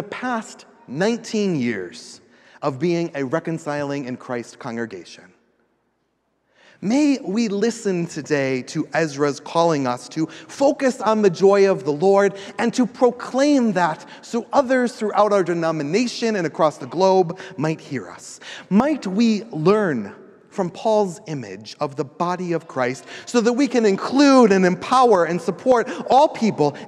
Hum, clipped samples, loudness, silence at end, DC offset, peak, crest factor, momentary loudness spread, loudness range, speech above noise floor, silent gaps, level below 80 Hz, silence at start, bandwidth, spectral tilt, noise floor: none; under 0.1%; -20 LUFS; 0 s; under 0.1%; -4 dBFS; 18 dB; 14 LU; 9 LU; 50 dB; none; -66 dBFS; 0 s; 11.5 kHz; -5.5 dB/octave; -69 dBFS